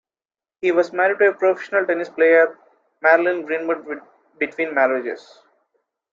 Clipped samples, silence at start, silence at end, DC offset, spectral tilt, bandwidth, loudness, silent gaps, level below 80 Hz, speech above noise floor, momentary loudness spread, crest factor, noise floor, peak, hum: under 0.1%; 0.65 s; 0.95 s; under 0.1%; -5.5 dB/octave; 7.4 kHz; -19 LUFS; none; -74 dBFS; over 71 dB; 11 LU; 18 dB; under -90 dBFS; -2 dBFS; none